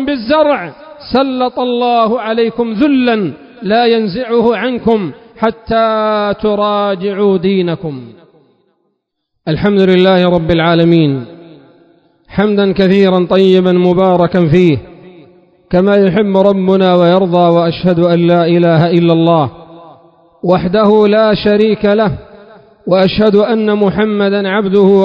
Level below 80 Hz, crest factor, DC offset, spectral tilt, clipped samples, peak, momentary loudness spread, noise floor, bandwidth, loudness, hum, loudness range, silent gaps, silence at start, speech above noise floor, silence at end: -40 dBFS; 12 dB; under 0.1%; -9 dB/octave; 0.5%; 0 dBFS; 8 LU; -69 dBFS; 5.6 kHz; -11 LUFS; none; 4 LU; none; 0 s; 59 dB; 0 s